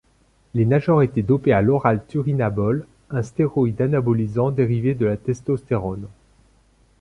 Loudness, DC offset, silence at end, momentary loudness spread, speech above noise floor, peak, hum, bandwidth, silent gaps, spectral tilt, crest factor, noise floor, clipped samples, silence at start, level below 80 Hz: -21 LUFS; under 0.1%; 0.9 s; 10 LU; 39 dB; -2 dBFS; none; 10 kHz; none; -9.5 dB/octave; 18 dB; -59 dBFS; under 0.1%; 0.55 s; -48 dBFS